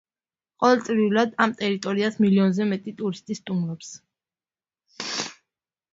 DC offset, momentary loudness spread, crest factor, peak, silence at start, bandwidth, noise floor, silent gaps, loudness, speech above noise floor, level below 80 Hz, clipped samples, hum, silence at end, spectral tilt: under 0.1%; 13 LU; 20 dB; -4 dBFS; 0.6 s; 7.8 kHz; under -90 dBFS; none; -23 LUFS; over 67 dB; -68 dBFS; under 0.1%; none; 0.6 s; -5.5 dB/octave